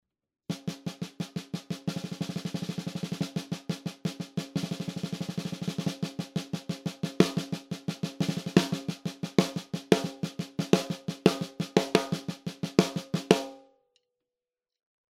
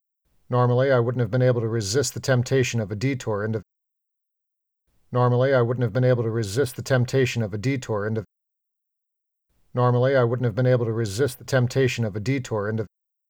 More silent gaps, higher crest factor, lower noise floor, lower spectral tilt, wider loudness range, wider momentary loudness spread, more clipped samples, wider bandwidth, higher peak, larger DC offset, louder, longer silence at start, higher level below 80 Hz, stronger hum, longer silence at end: neither; first, 30 dB vs 14 dB; first, under -90 dBFS vs -81 dBFS; about the same, -5.5 dB/octave vs -6 dB/octave; first, 7 LU vs 4 LU; first, 11 LU vs 7 LU; neither; about the same, 16 kHz vs 17 kHz; first, 0 dBFS vs -8 dBFS; neither; second, -31 LUFS vs -23 LUFS; about the same, 0.5 s vs 0.5 s; about the same, -64 dBFS vs -60 dBFS; neither; first, 1.5 s vs 0.45 s